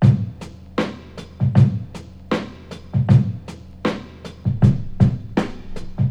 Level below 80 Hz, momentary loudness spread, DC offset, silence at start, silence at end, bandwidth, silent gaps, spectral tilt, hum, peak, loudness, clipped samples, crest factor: -36 dBFS; 20 LU; under 0.1%; 0 s; 0 s; 8.2 kHz; none; -8.5 dB/octave; none; 0 dBFS; -20 LUFS; under 0.1%; 20 dB